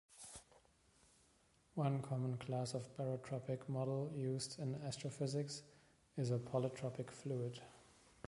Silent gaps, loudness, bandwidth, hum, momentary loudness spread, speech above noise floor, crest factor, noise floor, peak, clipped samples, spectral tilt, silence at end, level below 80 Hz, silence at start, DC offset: none; -44 LUFS; 11.5 kHz; none; 11 LU; 31 dB; 20 dB; -74 dBFS; -26 dBFS; under 0.1%; -6.5 dB/octave; 0.45 s; -76 dBFS; 0.1 s; under 0.1%